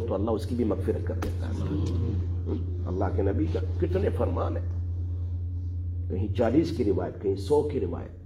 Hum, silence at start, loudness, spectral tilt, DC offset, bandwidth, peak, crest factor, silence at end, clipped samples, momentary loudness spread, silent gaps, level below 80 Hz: none; 0 s; -29 LUFS; -9 dB/octave; under 0.1%; 10.5 kHz; -10 dBFS; 18 dB; 0 s; under 0.1%; 7 LU; none; -44 dBFS